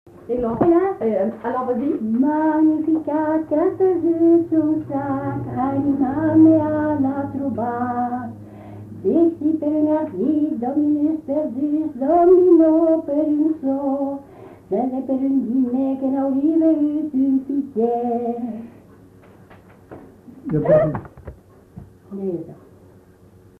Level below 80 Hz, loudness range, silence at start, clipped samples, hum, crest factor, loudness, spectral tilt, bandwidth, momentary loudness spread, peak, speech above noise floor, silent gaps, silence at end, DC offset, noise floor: -52 dBFS; 7 LU; 0.25 s; under 0.1%; none; 16 dB; -19 LUFS; -10.5 dB/octave; 3.2 kHz; 12 LU; -4 dBFS; 30 dB; none; 1.05 s; under 0.1%; -49 dBFS